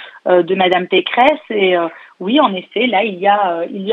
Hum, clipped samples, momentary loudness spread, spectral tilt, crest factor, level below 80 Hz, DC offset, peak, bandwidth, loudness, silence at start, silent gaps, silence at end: none; under 0.1%; 5 LU; -7 dB/octave; 14 dB; -64 dBFS; under 0.1%; 0 dBFS; 5.2 kHz; -14 LUFS; 0 s; none; 0 s